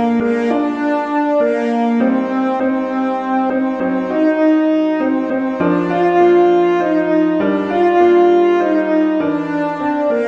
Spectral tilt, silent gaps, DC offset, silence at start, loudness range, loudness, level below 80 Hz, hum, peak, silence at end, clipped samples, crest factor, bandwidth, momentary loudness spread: -7.5 dB/octave; none; under 0.1%; 0 s; 3 LU; -15 LUFS; -56 dBFS; none; -2 dBFS; 0 s; under 0.1%; 12 dB; 7 kHz; 7 LU